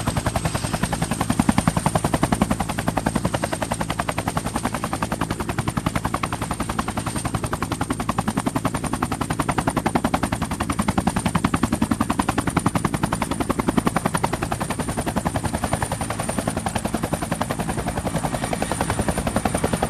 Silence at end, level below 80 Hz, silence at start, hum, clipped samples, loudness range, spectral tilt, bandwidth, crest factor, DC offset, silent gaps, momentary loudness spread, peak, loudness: 0 s; -36 dBFS; 0 s; none; under 0.1%; 3 LU; -5 dB/octave; 14 kHz; 22 dB; under 0.1%; none; 4 LU; -2 dBFS; -24 LUFS